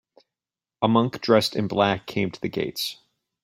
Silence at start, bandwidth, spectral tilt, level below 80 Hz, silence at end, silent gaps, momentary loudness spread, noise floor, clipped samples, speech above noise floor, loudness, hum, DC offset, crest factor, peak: 0.8 s; 16.5 kHz; -5.5 dB/octave; -60 dBFS; 0.5 s; none; 8 LU; under -90 dBFS; under 0.1%; over 67 dB; -24 LUFS; none; under 0.1%; 20 dB; -4 dBFS